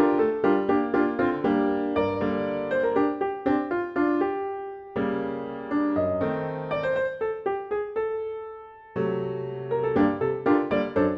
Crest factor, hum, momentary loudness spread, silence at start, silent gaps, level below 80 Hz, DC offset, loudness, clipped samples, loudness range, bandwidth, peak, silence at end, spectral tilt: 16 dB; none; 9 LU; 0 s; none; -56 dBFS; under 0.1%; -26 LUFS; under 0.1%; 4 LU; 5.4 kHz; -10 dBFS; 0 s; -9 dB/octave